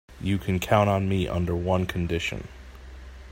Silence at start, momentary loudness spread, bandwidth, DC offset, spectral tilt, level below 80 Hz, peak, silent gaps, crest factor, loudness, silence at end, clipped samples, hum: 0.1 s; 23 LU; 16.5 kHz; under 0.1%; -6.5 dB/octave; -44 dBFS; -6 dBFS; none; 20 dB; -25 LUFS; 0 s; under 0.1%; none